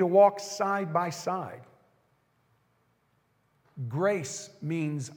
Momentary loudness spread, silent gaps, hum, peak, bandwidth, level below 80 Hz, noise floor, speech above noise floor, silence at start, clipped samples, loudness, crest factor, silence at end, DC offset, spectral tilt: 16 LU; none; none; -8 dBFS; 17 kHz; -84 dBFS; -71 dBFS; 43 dB; 0 s; under 0.1%; -29 LUFS; 20 dB; 0 s; under 0.1%; -5.5 dB/octave